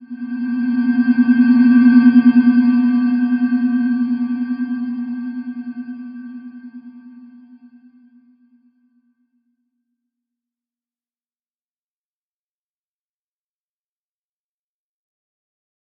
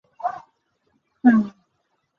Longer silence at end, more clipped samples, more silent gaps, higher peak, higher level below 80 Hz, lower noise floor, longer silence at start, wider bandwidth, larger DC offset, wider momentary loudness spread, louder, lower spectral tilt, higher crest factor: first, 8.9 s vs 0.7 s; neither; neither; about the same, -2 dBFS vs -4 dBFS; about the same, -72 dBFS vs -68 dBFS; first, under -90 dBFS vs -72 dBFS; second, 0 s vs 0.25 s; first, 5 kHz vs 3.8 kHz; neither; first, 21 LU vs 16 LU; first, -15 LUFS vs -21 LUFS; about the same, -9.5 dB/octave vs -9 dB/octave; about the same, 18 dB vs 20 dB